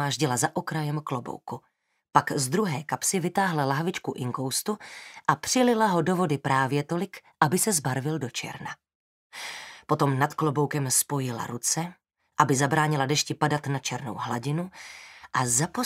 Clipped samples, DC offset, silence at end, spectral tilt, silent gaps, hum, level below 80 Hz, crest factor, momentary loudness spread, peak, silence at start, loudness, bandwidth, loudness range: under 0.1%; under 0.1%; 0 s; -4 dB/octave; 8.95-9.30 s; none; -68 dBFS; 24 dB; 14 LU; -4 dBFS; 0 s; -26 LUFS; 16 kHz; 3 LU